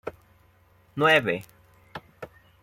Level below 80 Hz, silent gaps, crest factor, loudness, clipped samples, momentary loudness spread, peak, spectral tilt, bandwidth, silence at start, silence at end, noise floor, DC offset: -64 dBFS; none; 20 dB; -22 LUFS; under 0.1%; 25 LU; -8 dBFS; -5 dB/octave; 16.5 kHz; 0.05 s; 0.35 s; -60 dBFS; under 0.1%